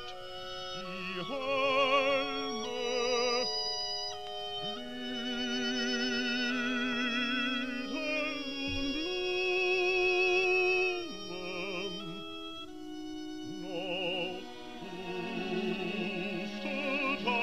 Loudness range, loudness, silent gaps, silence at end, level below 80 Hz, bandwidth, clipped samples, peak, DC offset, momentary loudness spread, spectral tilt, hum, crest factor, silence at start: 8 LU; -32 LUFS; none; 0 s; -58 dBFS; 14.5 kHz; under 0.1%; -16 dBFS; 0.4%; 15 LU; -3.5 dB/octave; none; 16 dB; 0 s